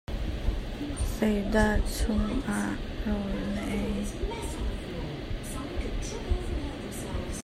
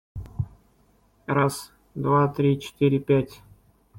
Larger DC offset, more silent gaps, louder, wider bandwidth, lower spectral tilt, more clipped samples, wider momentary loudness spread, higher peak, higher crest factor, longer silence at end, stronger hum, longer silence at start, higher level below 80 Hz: neither; neither; second, -32 LUFS vs -24 LUFS; about the same, 15.5 kHz vs 16.5 kHz; second, -5.5 dB/octave vs -7 dB/octave; neither; second, 10 LU vs 16 LU; second, -12 dBFS vs -8 dBFS; about the same, 18 dB vs 18 dB; about the same, 0 s vs 0 s; neither; about the same, 0.1 s vs 0.15 s; first, -34 dBFS vs -50 dBFS